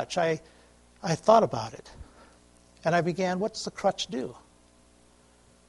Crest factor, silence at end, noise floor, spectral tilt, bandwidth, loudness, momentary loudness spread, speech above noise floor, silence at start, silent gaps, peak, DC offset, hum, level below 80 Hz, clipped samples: 24 dB; 1.3 s; -59 dBFS; -5 dB/octave; 11.5 kHz; -27 LUFS; 16 LU; 32 dB; 0 s; none; -6 dBFS; under 0.1%; 60 Hz at -55 dBFS; -60 dBFS; under 0.1%